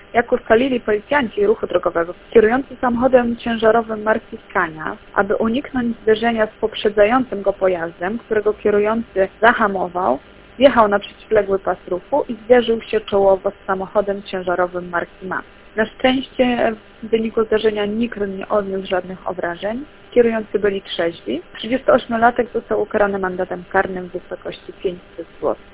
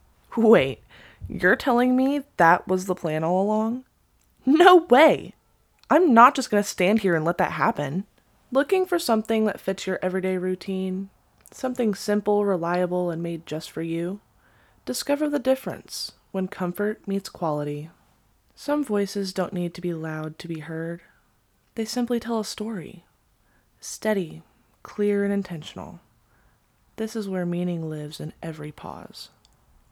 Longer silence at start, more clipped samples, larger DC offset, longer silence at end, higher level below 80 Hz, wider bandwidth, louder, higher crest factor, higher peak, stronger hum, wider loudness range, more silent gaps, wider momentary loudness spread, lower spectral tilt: second, 0.15 s vs 0.3 s; neither; neither; second, 0.1 s vs 0.65 s; first, -46 dBFS vs -60 dBFS; second, 4 kHz vs 18 kHz; first, -19 LUFS vs -23 LUFS; second, 18 dB vs 24 dB; about the same, 0 dBFS vs 0 dBFS; neither; second, 4 LU vs 12 LU; neither; second, 11 LU vs 18 LU; first, -9 dB/octave vs -5.5 dB/octave